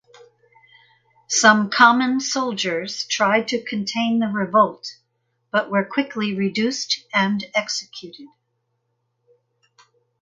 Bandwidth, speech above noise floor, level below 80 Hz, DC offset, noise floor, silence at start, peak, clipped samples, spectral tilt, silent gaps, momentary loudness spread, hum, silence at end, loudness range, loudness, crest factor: 9.4 kHz; 52 dB; -70 dBFS; under 0.1%; -73 dBFS; 1.3 s; 0 dBFS; under 0.1%; -3 dB/octave; none; 12 LU; none; 1.95 s; 7 LU; -20 LUFS; 22 dB